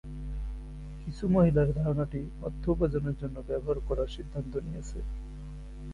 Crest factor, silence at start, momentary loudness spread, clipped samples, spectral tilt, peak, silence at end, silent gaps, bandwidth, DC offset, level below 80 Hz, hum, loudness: 18 dB; 0.05 s; 18 LU; under 0.1%; -9 dB/octave; -12 dBFS; 0 s; none; 10.5 kHz; under 0.1%; -38 dBFS; none; -31 LUFS